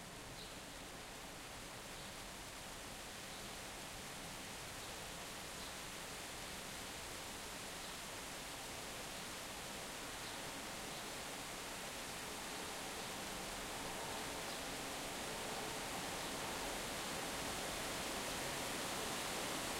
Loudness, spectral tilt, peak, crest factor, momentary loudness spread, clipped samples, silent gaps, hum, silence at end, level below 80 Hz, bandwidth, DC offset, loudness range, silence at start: -45 LUFS; -2 dB/octave; -30 dBFS; 16 dB; 8 LU; under 0.1%; none; none; 0 s; -62 dBFS; 16 kHz; under 0.1%; 6 LU; 0 s